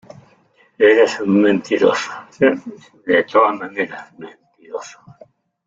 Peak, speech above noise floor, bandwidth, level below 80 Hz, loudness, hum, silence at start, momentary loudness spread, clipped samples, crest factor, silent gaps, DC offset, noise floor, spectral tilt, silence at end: -2 dBFS; 38 dB; 7.8 kHz; -62 dBFS; -16 LUFS; none; 0.8 s; 19 LU; under 0.1%; 16 dB; none; under 0.1%; -55 dBFS; -5.5 dB/octave; 0.75 s